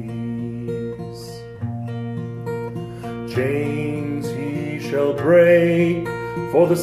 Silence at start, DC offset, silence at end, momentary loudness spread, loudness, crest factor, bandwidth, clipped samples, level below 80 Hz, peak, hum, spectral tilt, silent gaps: 0 s; under 0.1%; 0 s; 16 LU; -21 LUFS; 18 dB; 14.5 kHz; under 0.1%; -52 dBFS; -4 dBFS; none; -7.5 dB/octave; none